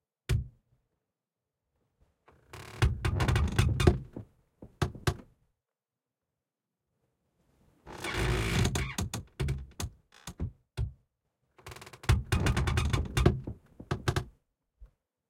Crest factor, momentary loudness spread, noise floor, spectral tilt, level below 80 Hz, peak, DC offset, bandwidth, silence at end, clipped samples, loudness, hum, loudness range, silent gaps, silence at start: 26 dB; 20 LU; under -90 dBFS; -5.5 dB/octave; -40 dBFS; -8 dBFS; under 0.1%; 16.5 kHz; 0.45 s; under 0.1%; -32 LUFS; none; 10 LU; none; 0.3 s